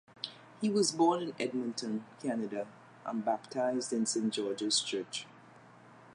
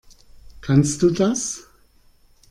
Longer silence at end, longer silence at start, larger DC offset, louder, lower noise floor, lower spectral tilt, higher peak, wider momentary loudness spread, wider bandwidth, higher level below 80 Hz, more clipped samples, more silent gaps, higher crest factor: second, 0 s vs 0.9 s; second, 0.2 s vs 0.5 s; neither; second, -34 LUFS vs -20 LUFS; about the same, -57 dBFS vs -55 dBFS; second, -3.5 dB/octave vs -5.5 dB/octave; second, -16 dBFS vs -4 dBFS; about the same, 13 LU vs 15 LU; second, 11.5 kHz vs 13 kHz; second, -84 dBFS vs -48 dBFS; neither; neither; about the same, 20 dB vs 18 dB